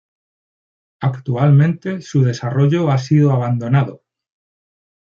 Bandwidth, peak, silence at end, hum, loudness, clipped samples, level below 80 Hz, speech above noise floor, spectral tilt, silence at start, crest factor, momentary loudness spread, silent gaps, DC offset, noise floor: 7 kHz; -2 dBFS; 1.15 s; none; -16 LUFS; under 0.1%; -58 dBFS; over 75 dB; -8.5 dB/octave; 1 s; 16 dB; 9 LU; none; under 0.1%; under -90 dBFS